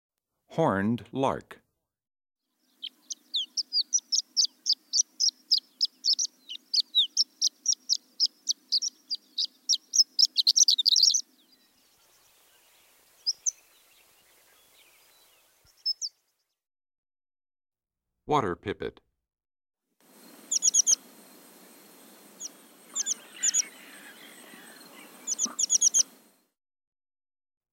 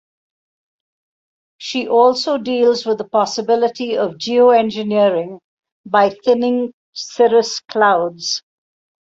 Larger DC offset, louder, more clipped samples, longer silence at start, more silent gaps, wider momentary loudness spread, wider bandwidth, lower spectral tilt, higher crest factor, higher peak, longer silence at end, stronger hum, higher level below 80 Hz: neither; second, -25 LUFS vs -16 LUFS; neither; second, 0.5 s vs 1.6 s; second, 16.98-17.03 s vs 5.44-5.57 s, 5.72-5.84 s, 6.73-6.93 s; first, 18 LU vs 10 LU; first, 16 kHz vs 7.8 kHz; second, -0.5 dB/octave vs -4 dB/octave; about the same, 20 dB vs 16 dB; second, -10 dBFS vs -2 dBFS; first, 1.7 s vs 0.8 s; neither; second, -70 dBFS vs -64 dBFS